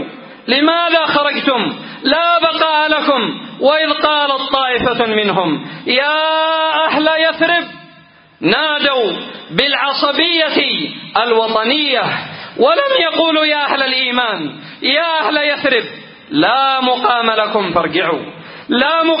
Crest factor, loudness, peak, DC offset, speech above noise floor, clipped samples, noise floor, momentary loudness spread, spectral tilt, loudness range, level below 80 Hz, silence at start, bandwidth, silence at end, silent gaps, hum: 14 dB; -14 LUFS; 0 dBFS; under 0.1%; 30 dB; under 0.1%; -44 dBFS; 7 LU; -7 dB/octave; 1 LU; -54 dBFS; 0 s; 5.4 kHz; 0 s; none; none